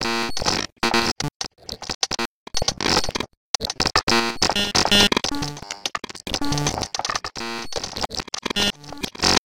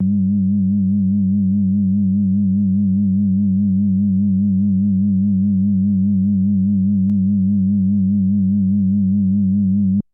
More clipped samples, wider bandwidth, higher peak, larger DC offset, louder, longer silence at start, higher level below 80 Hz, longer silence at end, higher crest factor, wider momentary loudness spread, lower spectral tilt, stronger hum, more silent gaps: neither; first, 17 kHz vs 0.7 kHz; first, -2 dBFS vs -10 dBFS; first, 0.8% vs under 0.1%; second, -22 LUFS vs -16 LUFS; about the same, 0 s vs 0 s; first, -40 dBFS vs -60 dBFS; second, 0 s vs 0.15 s; first, 22 dB vs 6 dB; first, 12 LU vs 0 LU; second, -2 dB/octave vs -16.5 dB/octave; neither; first, 0.72-0.76 s, 1.12-1.16 s, 1.35-1.40 s, 1.95-2.01 s, 2.26-2.46 s, 3.37-3.54 s, 4.03-4.07 s vs none